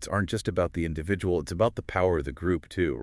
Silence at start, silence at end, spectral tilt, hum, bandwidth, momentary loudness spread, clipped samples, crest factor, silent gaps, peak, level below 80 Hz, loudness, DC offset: 0 s; 0 s; -6.5 dB/octave; none; 12 kHz; 3 LU; under 0.1%; 18 dB; none; -10 dBFS; -46 dBFS; -28 LUFS; under 0.1%